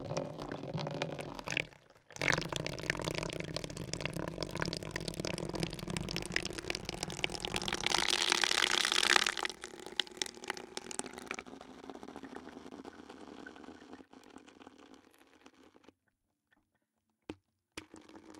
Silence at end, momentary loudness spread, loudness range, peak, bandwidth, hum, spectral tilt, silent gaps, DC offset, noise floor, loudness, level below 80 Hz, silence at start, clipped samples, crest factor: 0 s; 24 LU; 21 LU; -6 dBFS; 18 kHz; none; -2.5 dB/octave; none; under 0.1%; -83 dBFS; -35 LUFS; -60 dBFS; 0 s; under 0.1%; 32 dB